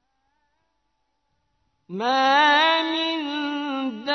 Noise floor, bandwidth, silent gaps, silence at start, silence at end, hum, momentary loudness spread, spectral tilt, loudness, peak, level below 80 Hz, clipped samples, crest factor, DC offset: -74 dBFS; 6.4 kHz; none; 1.9 s; 0 s; none; 12 LU; -3 dB/octave; -21 LUFS; -6 dBFS; -76 dBFS; under 0.1%; 18 dB; under 0.1%